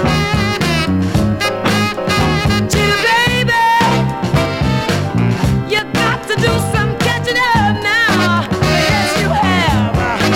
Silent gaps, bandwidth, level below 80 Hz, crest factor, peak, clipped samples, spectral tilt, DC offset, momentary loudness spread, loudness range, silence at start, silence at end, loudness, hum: none; 17 kHz; -30 dBFS; 12 dB; -2 dBFS; under 0.1%; -5 dB/octave; under 0.1%; 4 LU; 2 LU; 0 s; 0 s; -14 LUFS; none